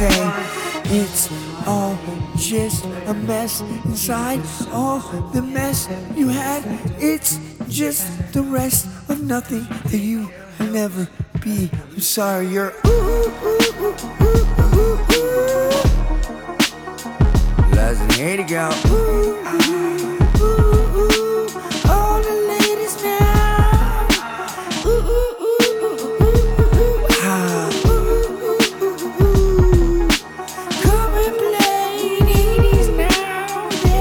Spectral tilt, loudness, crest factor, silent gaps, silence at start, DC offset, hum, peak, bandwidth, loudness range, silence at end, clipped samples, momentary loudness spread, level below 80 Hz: -5 dB/octave; -18 LUFS; 16 dB; none; 0 s; under 0.1%; none; -2 dBFS; over 20 kHz; 5 LU; 0 s; under 0.1%; 9 LU; -20 dBFS